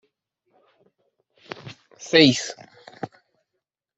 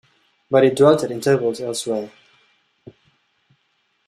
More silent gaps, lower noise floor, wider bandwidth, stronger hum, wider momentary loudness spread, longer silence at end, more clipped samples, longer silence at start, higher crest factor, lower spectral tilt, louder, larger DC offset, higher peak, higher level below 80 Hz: neither; first, -82 dBFS vs -67 dBFS; second, 8.4 kHz vs 13.5 kHz; neither; first, 26 LU vs 12 LU; second, 0.9 s vs 2 s; neither; first, 1.65 s vs 0.5 s; first, 24 dB vs 18 dB; second, -4 dB/octave vs -5.5 dB/octave; about the same, -18 LUFS vs -18 LUFS; neither; about the same, -2 dBFS vs -2 dBFS; about the same, -64 dBFS vs -62 dBFS